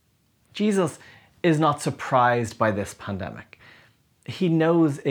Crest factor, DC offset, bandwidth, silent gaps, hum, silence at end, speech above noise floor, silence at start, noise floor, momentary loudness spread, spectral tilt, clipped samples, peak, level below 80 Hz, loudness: 18 dB; under 0.1%; 14.5 kHz; none; none; 0 s; 42 dB; 0.55 s; -65 dBFS; 17 LU; -6.5 dB/octave; under 0.1%; -6 dBFS; -62 dBFS; -23 LUFS